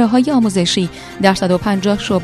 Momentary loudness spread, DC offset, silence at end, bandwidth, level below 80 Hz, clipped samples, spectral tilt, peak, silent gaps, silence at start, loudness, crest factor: 4 LU; under 0.1%; 0 s; 13.5 kHz; -42 dBFS; under 0.1%; -5 dB/octave; 0 dBFS; none; 0 s; -15 LUFS; 14 dB